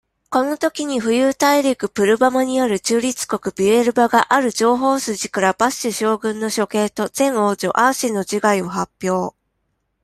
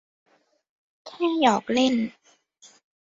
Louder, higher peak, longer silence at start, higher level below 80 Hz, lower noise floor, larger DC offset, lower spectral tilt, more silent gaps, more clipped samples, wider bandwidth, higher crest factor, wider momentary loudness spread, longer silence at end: first, -18 LUFS vs -23 LUFS; first, -2 dBFS vs -6 dBFS; second, 0.3 s vs 1.05 s; first, -58 dBFS vs -68 dBFS; first, -71 dBFS vs -57 dBFS; neither; about the same, -4 dB/octave vs -4 dB/octave; neither; neither; first, 15.5 kHz vs 7.6 kHz; about the same, 16 dB vs 20 dB; second, 7 LU vs 12 LU; second, 0.75 s vs 1.05 s